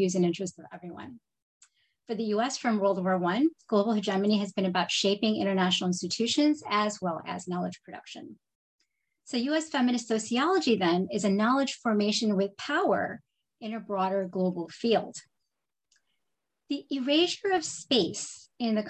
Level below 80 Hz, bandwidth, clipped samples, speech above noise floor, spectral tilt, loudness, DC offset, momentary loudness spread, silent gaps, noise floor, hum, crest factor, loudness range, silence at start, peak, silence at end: -74 dBFS; 9.4 kHz; under 0.1%; 59 dB; -4.5 dB/octave; -28 LUFS; under 0.1%; 14 LU; 1.42-1.60 s, 8.55-8.79 s; -86 dBFS; none; 18 dB; 6 LU; 0 s; -10 dBFS; 0 s